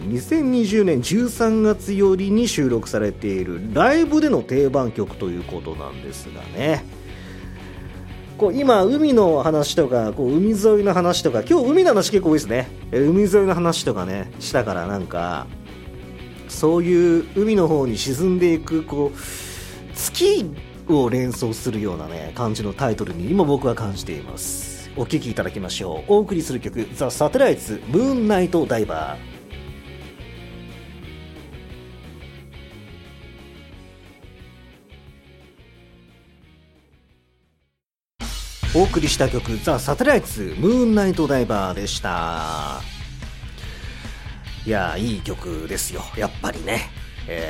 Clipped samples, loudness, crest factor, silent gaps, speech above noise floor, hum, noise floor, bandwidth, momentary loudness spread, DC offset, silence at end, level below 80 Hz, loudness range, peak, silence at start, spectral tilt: under 0.1%; -20 LUFS; 20 dB; none; 62 dB; none; -81 dBFS; 16.5 kHz; 21 LU; under 0.1%; 0 s; -38 dBFS; 11 LU; 0 dBFS; 0 s; -5.5 dB/octave